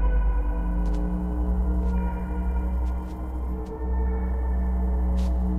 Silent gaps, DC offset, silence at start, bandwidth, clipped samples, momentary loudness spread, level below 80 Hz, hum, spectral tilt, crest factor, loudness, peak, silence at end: none; under 0.1%; 0 s; 3.2 kHz; under 0.1%; 6 LU; -24 dBFS; none; -9.5 dB/octave; 10 dB; -28 LUFS; -14 dBFS; 0 s